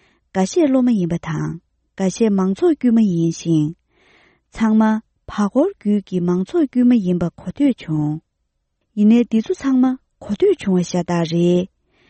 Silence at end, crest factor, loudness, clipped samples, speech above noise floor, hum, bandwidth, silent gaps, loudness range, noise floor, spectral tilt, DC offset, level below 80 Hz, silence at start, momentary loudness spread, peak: 0.45 s; 14 dB; -18 LUFS; under 0.1%; 55 dB; none; 8.6 kHz; none; 2 LU; -71 dBFS; -7.5 dB/octave; under 0.1%; -52 dBFS; 0.35 s; 10 LU; -4 dBFS